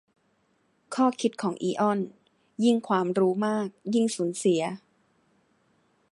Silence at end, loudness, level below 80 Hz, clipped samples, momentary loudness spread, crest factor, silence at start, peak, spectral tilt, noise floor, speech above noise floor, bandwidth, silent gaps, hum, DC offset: 1.35 s; -27 LUFS; -78 dBFS; under 0.1%; 10 LU; 18 dB; 0.9 s; -10 dBFS; -5.5 dB/octave; -69 dBFS; 44 dB; 11.5 kHz; none; none; under 0.1%